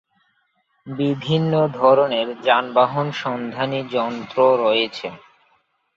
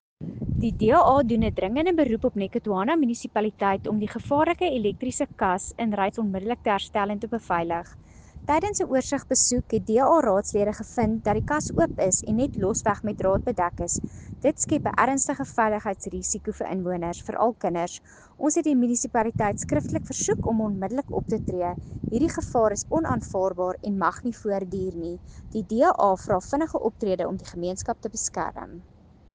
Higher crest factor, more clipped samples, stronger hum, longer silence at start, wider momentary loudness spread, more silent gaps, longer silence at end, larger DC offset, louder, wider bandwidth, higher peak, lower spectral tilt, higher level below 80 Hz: about the same, 18 dB vs 20 dB; neither; neither; first, 0.85 s vs 0.2 s; about the same, 10 LU vs 9 LU; neither; first, 0.8 s vs 0.55 s; neither; first, -19 LUFS vs -25 LUFS; second, 7.4 kHz vs 10 kHz; first, -2 dBFS vs -6 dBFS; first, -7 dB/octave vs -5 dB/octave; second, -64 dBFS vs -44 dBFS